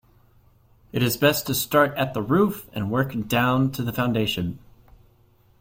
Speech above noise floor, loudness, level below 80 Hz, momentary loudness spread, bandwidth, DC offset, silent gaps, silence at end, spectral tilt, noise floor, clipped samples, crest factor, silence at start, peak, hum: 36 dB; -23 LUFS; -52 dBFS; 9 LU; 16.5 kHz; under 0.1%; none; 1.05 s; -5 dB/octave; -58 dBFS; under 0.1%; 18 dB; 0.95 s; -6 dBFS; none